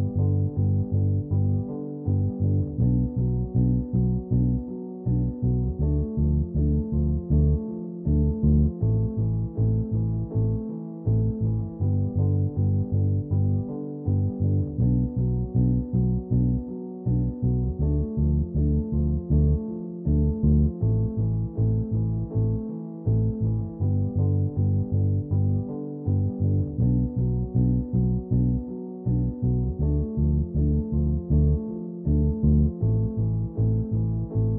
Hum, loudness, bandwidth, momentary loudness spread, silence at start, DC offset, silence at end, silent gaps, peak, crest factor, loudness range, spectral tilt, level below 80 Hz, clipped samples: none; -25 LUFS; 1.3 kHz; 5 LU; 0 s; under 0.1%; 0 s; none; -10 dBFS; 14 dB; 1 LU; -16 dB/octave; -30 dBFS; under 0.1%